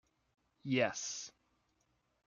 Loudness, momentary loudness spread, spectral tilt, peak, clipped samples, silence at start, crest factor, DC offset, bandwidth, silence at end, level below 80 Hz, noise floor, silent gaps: -37 LUFS; 17 LU; -3.5 dB/octave; -18 dBFS; under 0.1%; 0.65 s; 22 dB; under 0.1%; 7.4 kHz; 0.95 s; -82 dBFS; -79 dBFS; none